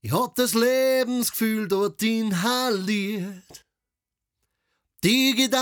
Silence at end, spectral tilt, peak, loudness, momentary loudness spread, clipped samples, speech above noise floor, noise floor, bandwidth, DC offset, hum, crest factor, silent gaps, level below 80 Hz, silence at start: 0 s; -4 dB/octave; -8 dBFS; -23 LUFS; 6 LU; under 0.1%; 64 dB; -87 dBFS; over 20 kHz; under 0.1%; none; 16 dB; none; -64 dBFS; 0.05 s